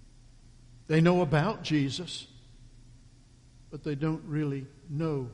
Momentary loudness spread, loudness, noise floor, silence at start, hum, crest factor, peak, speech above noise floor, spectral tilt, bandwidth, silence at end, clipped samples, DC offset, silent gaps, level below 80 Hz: 16 LU; -29 LUFS; -56 dBFS; 0.75 s; none; 20 dB; -10 dBFS; 28 dB; -7 dB/octave; 10.5 kHz; 0 s; under 0.1%; under 0.1%; none; -54 dBFS